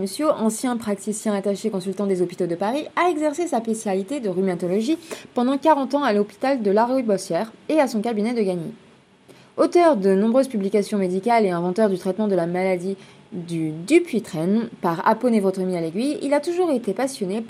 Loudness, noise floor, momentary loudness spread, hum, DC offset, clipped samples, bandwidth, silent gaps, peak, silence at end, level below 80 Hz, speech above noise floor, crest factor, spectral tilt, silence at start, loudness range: -22 LUFS; -51 dBFS; 7 LU; none; under 0.1%; under 0.1%; 14.5 kHz; none; -4 dBFS; 0 s; -72 dBFS; 29 dB; 18 dB; -6 dB/octave; 0 s; 3 LU